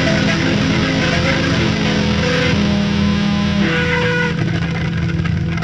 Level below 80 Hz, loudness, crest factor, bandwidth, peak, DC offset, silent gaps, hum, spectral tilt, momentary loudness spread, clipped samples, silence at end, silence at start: -34 dBFS; -16 LUFS; 14 dB; 8.6 kHz; -2 dBFS; under 0.1%; none; none; -5.5 dB/octave; 4 LU; under 0.1%; 0 s; 0 s